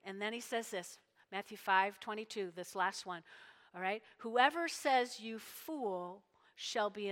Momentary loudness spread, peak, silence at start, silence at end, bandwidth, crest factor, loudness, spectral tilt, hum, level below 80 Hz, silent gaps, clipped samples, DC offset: 16 LU; -14 dBFS; 0.05 s; 0 s; 17 kHz; 24 dB; -38 LUFS; -2.5 dB/octave; none; under -90 dBFS; none; under 0.1%; under 0.1%